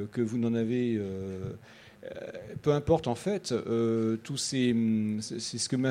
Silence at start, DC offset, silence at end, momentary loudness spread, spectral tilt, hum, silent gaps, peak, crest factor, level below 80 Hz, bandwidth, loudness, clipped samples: 0 s; under 0.1%; 0 s; 14 LU; -5.5 dB/octave; none; none; -12 dBFS; 18 dB; -58 dBFS; 12.5 kHz; -30 LUFS; under 0.1%